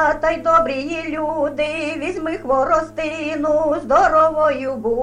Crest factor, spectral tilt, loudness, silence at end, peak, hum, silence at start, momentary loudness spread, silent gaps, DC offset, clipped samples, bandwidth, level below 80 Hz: 14 dB; -5 dB/octave; -18 LUFS; 0 s; -4 dBFS; none; 0 s; 9 LU; none; under 0.1%; under 0.1%; 10.5 kHz; -42 dBFS